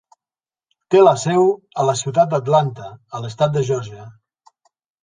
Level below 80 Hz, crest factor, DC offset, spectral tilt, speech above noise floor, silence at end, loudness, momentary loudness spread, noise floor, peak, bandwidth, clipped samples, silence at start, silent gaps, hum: -60 dBFS; 18 dB; under 0.1%; -6 dB/octave; over 73 dB; 0.9 s; -17 LUFS; 17 LU; under -90 dBFS; -2 dBFS; 9.8 kHz; under 0.1%; 0.9 s; none; none